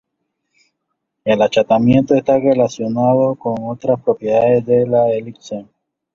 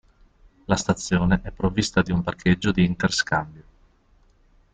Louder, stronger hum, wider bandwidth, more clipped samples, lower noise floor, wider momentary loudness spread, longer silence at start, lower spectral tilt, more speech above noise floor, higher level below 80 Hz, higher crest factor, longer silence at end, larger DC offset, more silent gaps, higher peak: first, -15 LUFS vs -23 LUFS; neither; second, 7.2 kHz vs 9.2 kHz; neither; first, -74 dBFS vs -58 dBFS; first, 11 LU vs 5 LU; first, 1.25 s vs 0.7 s; first, -7.5 dB/octave vs -5 dB/octave; first, 60 dB vs 36 dB; second, -52 dBFS vs -42 dBFS; about the same, 14 dB vs 18 dB; second, 0.5 s vs 1.15 s; neither; neither; first, -2 dBFS vs -6 dBFS